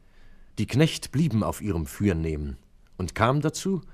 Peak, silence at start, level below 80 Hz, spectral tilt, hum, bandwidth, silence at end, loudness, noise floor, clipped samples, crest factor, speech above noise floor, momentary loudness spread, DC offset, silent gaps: -4 dBFS; 0.25 s; -42 dBFS; -6 dB/octave; none; 15.5 kHz; 0 s; -26 LUFS; -49 dBFS; under 0.1%; 22 dB; 24 dB; 14 LU; under 0.1%; none